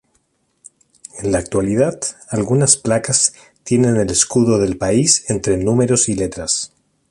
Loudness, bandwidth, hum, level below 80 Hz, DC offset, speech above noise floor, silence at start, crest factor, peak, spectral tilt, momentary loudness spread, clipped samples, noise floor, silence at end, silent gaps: -16 LUFS; 11.5 kHz; none; -42 dBFS; under 0.1%; 48 dB; 1.15 s; 18 dB; 0 dBFS; -4 dB/octave; 9 LU; under 0.1%; -64 dBFS; 0.45 s; none